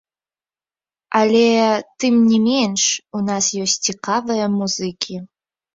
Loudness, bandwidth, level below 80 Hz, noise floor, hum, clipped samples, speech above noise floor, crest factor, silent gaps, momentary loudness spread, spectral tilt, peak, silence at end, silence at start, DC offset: -17 LUFS; 7.8 kHz; -62 dBFS; under -90 dBFS; none; under 0.1%; over 73 dB; 18 dB; none; 9 LU; -3.5 dB/octave; -2 dBFS; 0.5 s; 1.1 s; under 0.1%